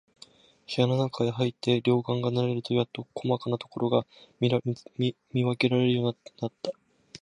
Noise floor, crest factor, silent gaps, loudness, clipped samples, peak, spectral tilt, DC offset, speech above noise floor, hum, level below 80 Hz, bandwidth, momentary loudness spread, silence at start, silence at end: -55 dBFS; 20 dB; none; -28 LUFS; under 0.1%; -8 dBFS; -7.5 dB/octave; under 0.1%; 28 dB; none; -68 dBFS; 10.5 kHz; 10 LU; 0.7 s; 0.05 s